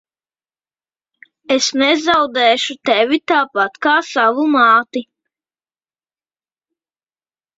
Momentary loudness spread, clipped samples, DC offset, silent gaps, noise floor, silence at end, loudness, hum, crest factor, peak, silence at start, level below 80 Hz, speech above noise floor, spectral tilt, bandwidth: 6 LU; under 0.1%; under 0.1%; none; under -90 dBFS; 2.55 s; -14 LUFS; none; 16 dB; -2 dBFS; 1.5 s; -62 dBFS; over 75 dB; -1.5 dB/octave; 8 kHz